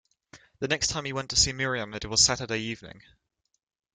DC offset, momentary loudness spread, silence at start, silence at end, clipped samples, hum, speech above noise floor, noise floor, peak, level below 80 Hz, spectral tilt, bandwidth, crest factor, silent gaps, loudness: under 0.1%; 13 LU; 0.35 s; 0.95 s; under 0.1%; none; 28 dB; -56 dBFS; -6 dBFS; -50 dBFS; -1.5 dB/octave; 11.5 kHz; 24 dB; none; -25 LUFS